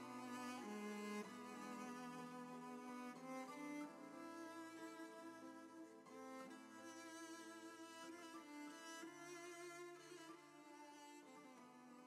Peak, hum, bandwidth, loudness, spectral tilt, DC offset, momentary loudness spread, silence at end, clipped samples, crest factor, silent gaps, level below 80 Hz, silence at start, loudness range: -40 dBFS; none; 15.5 kHz; -55 LUFS; -3.5 dB/octave; under 0.1%; 10 LU; 0 s; under 0.1%; 16 dB; none; under -90 dBFS; 0 s; 5 LU